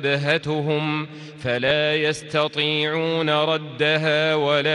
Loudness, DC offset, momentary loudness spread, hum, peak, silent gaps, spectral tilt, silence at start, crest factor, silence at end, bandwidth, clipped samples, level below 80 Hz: -21 LUFS; under 0.1%; 6 LU; none; -8 dBFS; none; -5 dB/octave; 0 s; 14 dB; 0 s; 11.5 kHz; under 0.1%; -60 dBFS